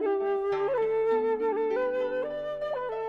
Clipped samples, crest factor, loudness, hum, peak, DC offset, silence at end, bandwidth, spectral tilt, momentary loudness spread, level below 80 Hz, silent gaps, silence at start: under 0.1%; 10 dB; -28 LUFS; none; -18 dBFS; under 0.1%; 0 s; 5.6 kHz; -6.5 dB/octave; 6 LU; -62 dBFS; none; 0 s